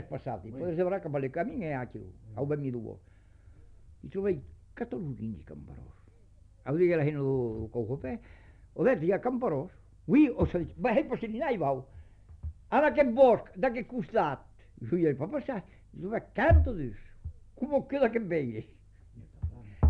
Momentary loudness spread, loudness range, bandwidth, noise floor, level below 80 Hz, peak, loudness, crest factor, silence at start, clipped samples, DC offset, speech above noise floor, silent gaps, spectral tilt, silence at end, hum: 20 LU; 9 LU; 5.4 kHz; -57 dBFS; -42 dBFS; -10 dBFS; -30 LUFS; 20 dB; 0 s; under 0.1%; under 0.1%; 28 dB; none; -10 dB/octave; 0 s; none